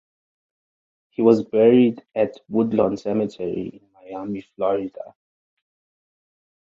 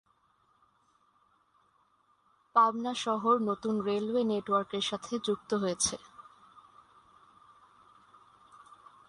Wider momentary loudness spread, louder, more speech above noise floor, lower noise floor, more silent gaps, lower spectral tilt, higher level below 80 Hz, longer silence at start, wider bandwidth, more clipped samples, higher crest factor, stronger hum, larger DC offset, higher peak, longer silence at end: first, 19 LU vs 7 LU; first, -21 LUFS vs -30 LUFS; first, over 70 dB vs 40 dB; first, under -90 dBFS vs -70 dBFS; neither; first, -8.5 dB/octave vs -3.5 dB/octave; first, -62 dBFS vs -70 dBFS; second, 1.2 s vs 2.55 s; second, 7.4 kHz vs 11.5 kHz; neither; about the same, 20 dB vs 22 dB; neither; neither; first, -2 dBFS vs -12 dBFS; second, 1.65 s vs 2.9 s